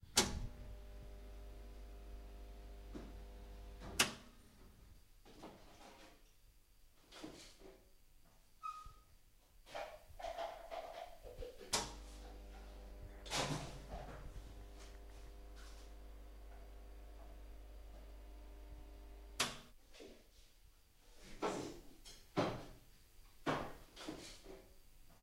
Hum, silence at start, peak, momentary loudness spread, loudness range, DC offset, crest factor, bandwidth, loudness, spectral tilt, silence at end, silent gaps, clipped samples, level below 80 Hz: none; 0 s; -18 dBFS; 23 LU; 13 LU; under 0.1%; 32 dB; 16 kHz; -46 LUFS; -2.5 dB/octave; 0 s; none; under 0.1%; -56 dBFS